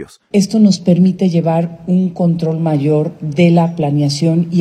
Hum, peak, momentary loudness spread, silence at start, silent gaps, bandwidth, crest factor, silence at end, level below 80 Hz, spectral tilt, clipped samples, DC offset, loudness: none; 0 dBFS; 5 LU; 0 s; none; 9.6 kHz; 12 dB; 0 s; -56 dBFS; -7.5 dB/octave; under 0.1%; under 0.1%; -14 LUFS